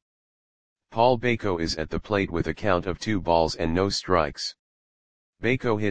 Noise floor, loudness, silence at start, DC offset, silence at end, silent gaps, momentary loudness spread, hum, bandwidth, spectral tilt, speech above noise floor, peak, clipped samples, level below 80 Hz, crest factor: under -90 dBFS; -25 LUFS; 0 s; 0.8%; 0 s; 0.02-0.76 s, 4.59-5.33 s; 7 LU; none; 9.8 kHz; -5.5 dB/octave; over 66 dB; -4 dBFS; under 0.1%; -44 dBFS; 20 dB